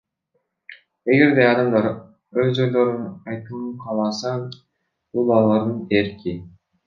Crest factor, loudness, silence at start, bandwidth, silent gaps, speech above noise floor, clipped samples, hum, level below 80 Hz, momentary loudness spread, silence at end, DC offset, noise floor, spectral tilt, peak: 18 dB; -20 LUFS; 0.7 s; 7.2 kHz; none; 53 dB; under 0.1%; none; -56 dBFS; 15 LU; 0.4 s; under 0.1%; -72 dBFS; -7 dB/octave; -2 dBFS